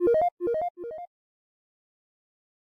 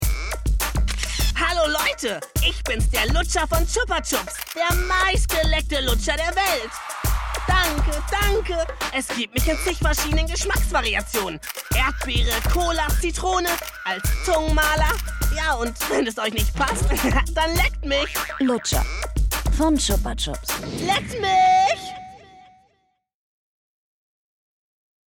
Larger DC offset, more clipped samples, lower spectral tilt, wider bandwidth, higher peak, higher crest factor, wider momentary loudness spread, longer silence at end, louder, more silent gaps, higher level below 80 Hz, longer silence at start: neither; neither; first, -8.5 dB/octave vs -3.5 dB/octave; second, 5 kHz vs 19 kHz; second, -16 dBFS vs -8 dBFS; about the same, 16 dB vs 14 dB; first, 18 LU vs 6 LU; second, 1.7 s vs 2.7 s; second, -27 LUFS vs -22 LUFS; first, 0.32-0.37 s, 0.70-0.75 s vs none; second, -64 dBFS vs -26 dBFS; about the same, 0 s vs 0 s